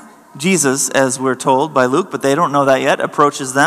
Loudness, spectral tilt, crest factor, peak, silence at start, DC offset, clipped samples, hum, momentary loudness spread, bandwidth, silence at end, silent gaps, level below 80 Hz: -14 LUFS; -3.5 dB/octave; 14 dB; 0 dBFS; 0.35 s; under 0.1%; 0.2%; none; 3 LU; 15 kHz; 0 s; none; -66 dBFS